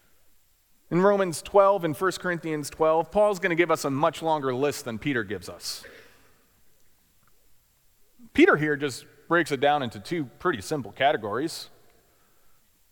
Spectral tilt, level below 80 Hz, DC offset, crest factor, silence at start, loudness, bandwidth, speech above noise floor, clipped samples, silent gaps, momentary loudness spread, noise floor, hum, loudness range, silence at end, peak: -5 dB/octave; -60 dBFS; under 0.1%; 20 dB; 0.9 s; -25 LUFS; 19 kHz; 37 dB; under 0.1%; none; 13 LU; -62 dBFS; none; 9 LU; 1.25 s; -6 dBFS